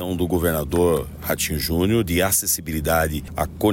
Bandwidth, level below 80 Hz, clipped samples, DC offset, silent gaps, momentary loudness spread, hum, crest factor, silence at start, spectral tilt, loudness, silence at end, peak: 16.5 kHz; -34 dBFS; under 0.1%; under 0.1%; none; 6 LU; none; 14 dB; 0 s; -4.5 dB/octave; -21 LUFS; 0 s; -6 dBFS